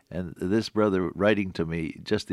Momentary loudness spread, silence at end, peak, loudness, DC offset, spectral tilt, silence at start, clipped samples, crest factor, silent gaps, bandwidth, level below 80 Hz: 8 LU; 0 s; -8 dBFS; -27 LUFS; under 0.1%; -6.5 dB/octave; 0.1 s; under 0.1%; 18 dB; none; 12.5 kHz; -56 dBFS